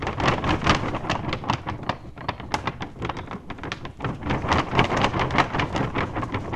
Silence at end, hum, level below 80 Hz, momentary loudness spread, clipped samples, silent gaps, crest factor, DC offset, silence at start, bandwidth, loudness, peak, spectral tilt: 0 s; none; -40 dBFS; 11 LU; under 0.1%; none; 26 dB; under 0.1%; 0 s; 12 kHz; -25 LUFS; 0 dBFS; -5.5 dB/octave